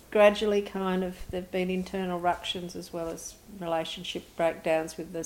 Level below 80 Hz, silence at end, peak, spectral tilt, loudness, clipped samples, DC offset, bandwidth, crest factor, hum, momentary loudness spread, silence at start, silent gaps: -54 dBFS; 0 s; -8 dBFS; -5 dB/octave; -30 LUFS; under 0.1%; under 0.1%; 16.5 kHz; 22 dB; none; 13 LU; 0.1 s; none